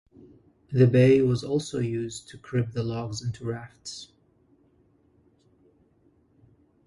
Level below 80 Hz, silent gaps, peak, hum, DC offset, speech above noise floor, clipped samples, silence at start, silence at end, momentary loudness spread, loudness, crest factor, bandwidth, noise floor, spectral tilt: -58 dBFS; none; -8 dBFS; none; under 0.1%; 39 dB; under 0.1%; 0.7 s; 2.8 s; 20 LU; -25 LUFS; 20 dB; 11.5 kHz; -63 dBFS; -7 dB/octave